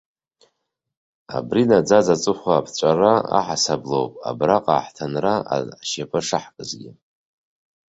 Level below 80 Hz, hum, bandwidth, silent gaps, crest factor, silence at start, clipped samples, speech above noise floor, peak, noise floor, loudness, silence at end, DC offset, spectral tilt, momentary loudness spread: -58 dBFS; none; 8.2 kHz; none; 20 dB; 1.3 s; under 0.1%; 56 dB; -2 dBFS; -76 dBFS; -20 LUFS; 1 s; under 0.1%; -4.5 dB/octave; 12 LU